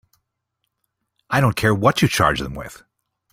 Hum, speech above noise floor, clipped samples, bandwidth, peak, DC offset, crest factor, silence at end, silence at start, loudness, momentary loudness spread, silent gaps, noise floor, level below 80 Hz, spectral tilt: none; 58 dB; under 0.1%; 16.5 kHz; -2 dBFS; under 0.1%; 20 dB; 0.6 s; 1.3 s; -18 LUFS; 15 LU; none; -76 dBFS; -44 dBFS; -5 dB/octave